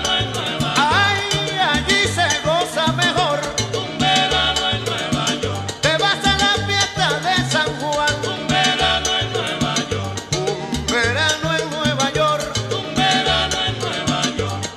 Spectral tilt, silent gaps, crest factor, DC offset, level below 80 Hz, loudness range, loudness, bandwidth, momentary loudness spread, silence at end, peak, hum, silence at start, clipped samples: -3 dB/octave; none; 16 dB; under 0.1%; -38 dBFS; 2 LU; -18 LUFS; 14.5 kHz; 6 LU; 0 s; -2 dBFS; none; 0 s; under 0.1%